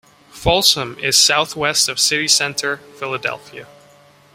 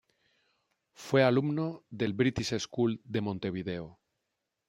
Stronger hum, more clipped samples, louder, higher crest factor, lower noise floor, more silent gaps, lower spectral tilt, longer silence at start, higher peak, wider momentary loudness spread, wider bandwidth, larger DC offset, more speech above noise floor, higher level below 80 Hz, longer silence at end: neither; neither; first, -15 LUFS vs -31 LUFS; about the same, 20 dB vs 22 dB; second, -49 dBFS vs -84 dBFS; neither; second, -1 dB/octave vs -6 dB/octave; second, 0.35 s vs 1 s; first, 0 dBFS vs -10 dBFS; about the same, 13 LU vs 13 LU; about the same, 16.5 kHz vs 16 kHz; neither; second, 31 dB vs 54 dB; first, -44 dBFS vs -64 dBFS; about the same, 0.7 s vs 0.75 s